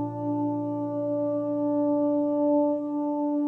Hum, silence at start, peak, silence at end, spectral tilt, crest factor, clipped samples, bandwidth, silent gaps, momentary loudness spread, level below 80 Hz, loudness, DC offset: none; 0 s; -16 dBFS; 0 s; -12 dB/octave; 10 dB; under 0.1%; 1.9 kHz; none; 6 LU; -74 dBFS; -26 LUFS; under 0.1%